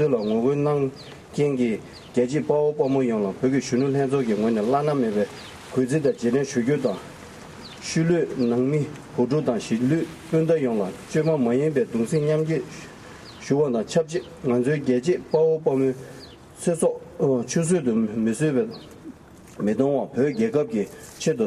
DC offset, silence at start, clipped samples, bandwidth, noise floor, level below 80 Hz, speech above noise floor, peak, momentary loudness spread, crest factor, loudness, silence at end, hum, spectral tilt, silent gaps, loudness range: under 0.1%; 0 s; under 0.1%; 13 kHz; -44 dBFS; -58 dBFS; 21 dB; -8 dBFS; 13 LU; 16 dB; -23 LUFS; 0 s; none; -6.5 dB/octave; none; 2 LU